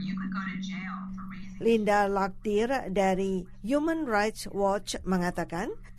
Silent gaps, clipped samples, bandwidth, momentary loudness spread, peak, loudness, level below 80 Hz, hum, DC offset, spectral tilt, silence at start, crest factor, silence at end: none; under 0.1%; 13.5 kHz; 10 LU; -14 dBFS; -29 LUFS; -48 dBFS; none; under 0.1%; -5.5 dB/octave; 0 s; 16 dB; 0 s